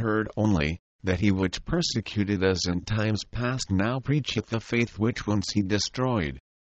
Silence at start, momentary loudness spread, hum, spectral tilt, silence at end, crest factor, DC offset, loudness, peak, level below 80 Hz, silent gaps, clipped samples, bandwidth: 0 s; 5 LU; none; -5.5 dB/octave; 0.25 s; 16 dB; under 0.1%; -27 LUFS; -10 dBFS; -44 dBFS; 0.79-0.99 s; under 0.1%; 8.6 kHz